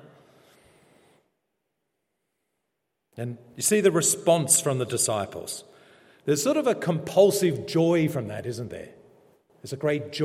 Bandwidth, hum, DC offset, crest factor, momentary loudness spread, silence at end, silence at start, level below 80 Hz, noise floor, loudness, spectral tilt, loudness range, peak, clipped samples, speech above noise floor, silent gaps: 16.5 kHz; none; under 0.1%; 20 dB; 16 LU; 0 s; 3.15 s; -70 dBFS; -80 dBFS; -24 LUFS; -4 dB/octave; 5 LU; -6 dBFS; under 0.1%; 56 dB; none